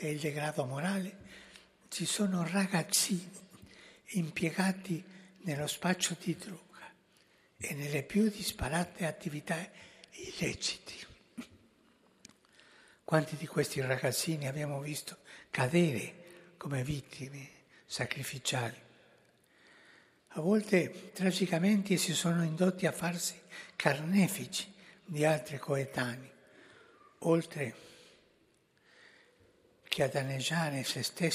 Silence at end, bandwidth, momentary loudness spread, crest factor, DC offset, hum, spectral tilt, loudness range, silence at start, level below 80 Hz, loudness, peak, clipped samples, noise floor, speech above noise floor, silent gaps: 0 s; 15.5 kHz; 20 LU; 26 dB; under 0.1%; none; -4.5 dB/octave; 8 LU; 0 s; -64 dBFS; -34 LUFS; -8 dBFS; under 0.1%; -70 dBFS; 36 dB; none